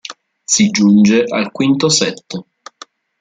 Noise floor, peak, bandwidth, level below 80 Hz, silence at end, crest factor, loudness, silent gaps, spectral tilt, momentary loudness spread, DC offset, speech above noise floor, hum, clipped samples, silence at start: -41 dBFS; -2 dBFS; 9.4 kHz; -56 dBFS; 0.8 s; 14 dB; -13 LUFS; none; -4 dB/octave; 19 LU; under 0.1%; 29 dB; none; under 0.1%; 0.1 s